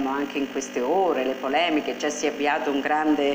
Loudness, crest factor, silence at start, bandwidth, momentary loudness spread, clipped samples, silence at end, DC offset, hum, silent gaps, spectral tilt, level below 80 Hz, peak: -24 LUFS; 14 dB; 0 s; 16 kHz; 5 LU; under 0.1%; 0 s; under 0.1%; none; none; -3 dB/octave; -62 dBFS; -10 dBFS